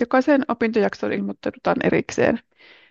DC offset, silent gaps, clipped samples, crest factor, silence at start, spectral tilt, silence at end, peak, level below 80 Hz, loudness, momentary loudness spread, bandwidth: under 0.1%; none; under 0.1%; 16 dB; 0 s; -6 dB/octave; 0.5 s; -4 dBFS; -58 dBFS; -21 LUFS; 8 LU; 8 kHz